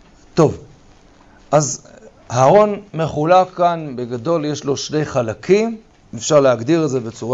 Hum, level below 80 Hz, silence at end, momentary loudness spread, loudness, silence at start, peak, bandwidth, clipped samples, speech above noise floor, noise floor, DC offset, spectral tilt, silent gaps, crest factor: none; -50 dBFS; 0 s; 11 LU; -17 LUFS; 0.35 s; -2 dBFS; 8 kHz; under 0.1%; 31 dB; -47 dBFS; under 0.1%; -5.5 dB/octave; none; 14 dB